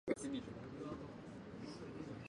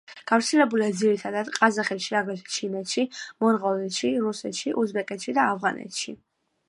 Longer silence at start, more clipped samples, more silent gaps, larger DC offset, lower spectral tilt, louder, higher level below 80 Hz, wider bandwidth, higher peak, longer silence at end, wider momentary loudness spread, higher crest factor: about the same, 0.05 s vs 0.1 s; neither; neither; neither; first, -6 dB/octave vs -3.5 dB/octave; second, -48 LUFS vs -25 LUFS; first, -68 dBFS vs -76 dBFS; about the same, 11 kHz vs 11.5 kHz; second, -24 dBFS vs -4 dBFS; second, 0 s vs 0.55 s; about the same, 9 LU vs 8 LU; about the same, 24 dB vs 22 dB